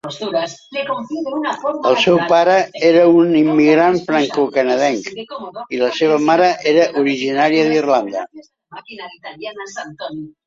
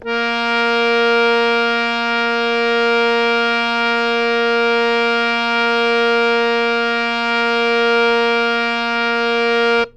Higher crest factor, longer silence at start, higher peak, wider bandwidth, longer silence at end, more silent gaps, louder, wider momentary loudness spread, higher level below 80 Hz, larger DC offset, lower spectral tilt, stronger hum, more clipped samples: about the same, 14 dB vs 12 dB; about the same, 0.05 s vs 0 s; about the same, -2 dBFS vs -4 dBFS; second, 7.6 kHz vs 9 kHz; about the same, 0.15 s vs 0.05 s; neither; about the same, -15 LUFS vs -15 LUFS; first, 17 LU vs 3 LU; second, -62 dBFS vs -50 dBFS; neither; first, -5 dB/octave vs -3 dB/octave; neither; neither